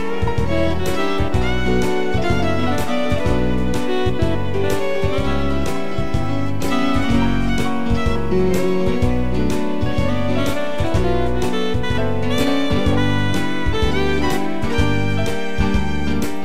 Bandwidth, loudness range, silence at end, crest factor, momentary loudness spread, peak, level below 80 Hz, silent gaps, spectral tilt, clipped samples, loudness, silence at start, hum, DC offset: 16 kHz; 1 LU; 0 s; 14 dB; 3 LU; -4 dBFS; -28 dBFS; none; -6 dB/octave; under 0.1%; -20 LUFS; 0 s; none; 10%